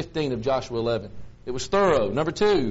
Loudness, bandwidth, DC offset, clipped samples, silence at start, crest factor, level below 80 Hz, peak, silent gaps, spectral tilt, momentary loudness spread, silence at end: -24 LUFS; 8 kHz; under 0.1%; under 0.1%; 0 s; 18 dB; -46 dBFS; -6 dBFS; none; -4.5 dB/octave; 13 LU; 0 s